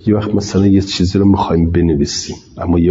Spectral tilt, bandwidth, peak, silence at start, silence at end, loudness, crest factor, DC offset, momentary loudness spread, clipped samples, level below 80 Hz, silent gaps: -6.5 dB/octave; 7.8 kHz; -2 dBFS; 0.05 s; 0 s; -14 LUFS; 10 dB; under 0.1%; 8 LU; under 0.1%; -34 dBFS; none